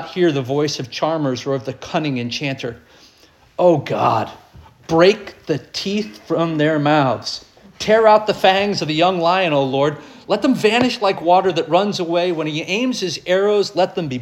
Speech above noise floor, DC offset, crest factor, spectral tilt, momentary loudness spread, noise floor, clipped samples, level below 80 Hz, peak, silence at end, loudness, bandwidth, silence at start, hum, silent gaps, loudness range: 34 dB; under 0.1%; 16 dB; -5.5 dB/octave; 10 LU; -51 dBFS; under 0.1%; -56 dBFS; -2 dBFS; 0 s; -18 LUFS; 15 kHz; 0 s; none; none; 5 LU